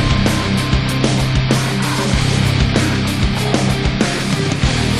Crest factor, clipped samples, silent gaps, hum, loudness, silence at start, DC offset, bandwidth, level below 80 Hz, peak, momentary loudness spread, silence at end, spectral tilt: 14 dB; under 0.1%; none; none; -16 LUFS; 0 s; 1%; 13.5 kHz; -24 dBFS; 0 dBFS; 2 LU; 0 s; -5 dB/octave